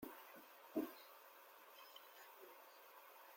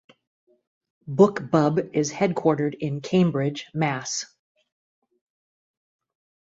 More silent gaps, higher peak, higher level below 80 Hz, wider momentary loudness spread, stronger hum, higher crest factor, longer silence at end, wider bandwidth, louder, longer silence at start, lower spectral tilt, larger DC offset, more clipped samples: neither; second, -32 dBFS vs -4 dBFS; second, under -90 dBFS vs -64 dBFS; first, 14 LU vs 10 LU; neither; about the same, 24 dB vs 22 dB; second, 0 s vs 2.2 s; first, 16.5 kHz vs 8 kHz; second, -55 LUFS vs -23 LUFS; second, 0 s vs 1.05 s; second, -4 dB/octave vs -6 dB/octave; neither; neither